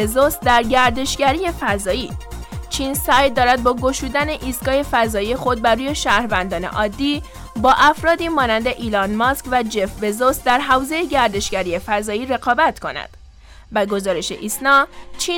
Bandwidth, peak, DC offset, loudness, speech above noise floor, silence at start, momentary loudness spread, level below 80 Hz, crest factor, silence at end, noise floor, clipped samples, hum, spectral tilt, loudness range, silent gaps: 19 kHz; -2 dBFS; under 0.1%; -18 LUFS; 24 dB; 0 s; 9 LU; -36 dBFS; 16 dB; 0 s; -42 dBFS; under 0.1%; none; -3.5 dB/octave; 2 LU; none